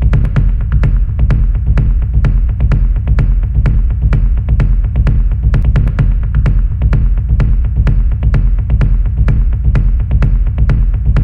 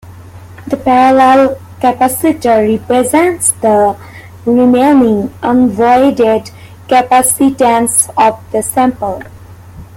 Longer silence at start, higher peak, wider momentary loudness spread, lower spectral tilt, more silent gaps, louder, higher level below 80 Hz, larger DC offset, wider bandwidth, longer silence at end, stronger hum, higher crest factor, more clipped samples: about the same, 0 s vs 0.05 s; about the same, 0 dBFS vs 0 dBFS; second, 1 LU vs 9 LU; first, -9.5 dB/octave vs -4 dB/octave; neither; second, -14 LUFS vs -10 LUFS; first, -10 dBFS vs -44 dBFS; neither; second, 3.3 kHz vs 17 kHz; second, 0 s vs 0.15 s; neither; about the same, 10 dB vs 10 dB; neither